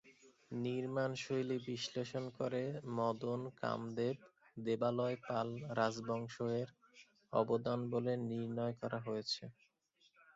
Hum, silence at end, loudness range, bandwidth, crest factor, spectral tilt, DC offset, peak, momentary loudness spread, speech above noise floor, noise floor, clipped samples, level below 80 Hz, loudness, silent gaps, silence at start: none; 0.05 s; 1 LU; 7.6 kHz; 20 dB; -5 dB/octave; under 0.1%; -20 dBFS; 6 LU; 36 dB; -75 dBFS; under 0.1%; -78 dBFS; -40 LUFS; none; 0.05 s